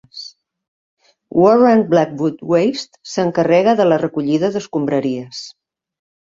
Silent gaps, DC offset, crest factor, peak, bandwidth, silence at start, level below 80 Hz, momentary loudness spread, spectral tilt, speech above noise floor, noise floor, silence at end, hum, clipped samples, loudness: 0.68-0.97 s; under 0.1%; 16 dB; -2 dBFS; 7.8 kHz; 0.15 s; -60 dBFS; 19 LU; -6.5 dB/octave; 23 dB; -38 dBFS; 0.85 s; none; under 0.1%; -16 LUFS